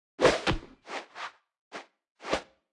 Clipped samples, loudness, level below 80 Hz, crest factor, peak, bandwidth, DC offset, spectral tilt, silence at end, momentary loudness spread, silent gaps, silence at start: under 0.1%; -31 LUFS; -48 dBFS; 24 dB; -8 dBFS; 12 kHz; under 0.1%; -4 dB/octave; 0.3 s; 21 LU; 1.61-1.71 s, 2.11-2.15 s; 0.2 s